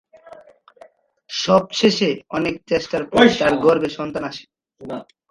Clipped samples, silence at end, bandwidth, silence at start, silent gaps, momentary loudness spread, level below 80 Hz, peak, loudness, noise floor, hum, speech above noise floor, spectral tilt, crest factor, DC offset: under 0.1%; 0.25 s; 11 kHz; 0.3 s; none; 18 LU; -54 dBFS; 0 dBFS; -18 LUFS; -49 dBFS; none; 31 dB; -4.5 dB/octave; 20 dB; under 0.1%